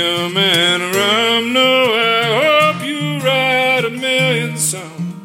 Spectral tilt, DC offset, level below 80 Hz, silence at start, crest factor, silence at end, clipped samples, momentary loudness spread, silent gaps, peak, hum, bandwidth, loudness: -3 dB/octave; under 0.1%; -66 dBFS; 0 s; 12 dB; 0 s; under 0.1%; 7 LU; none; -2 dBFS; none; 16.5 kHz; -13 LUFS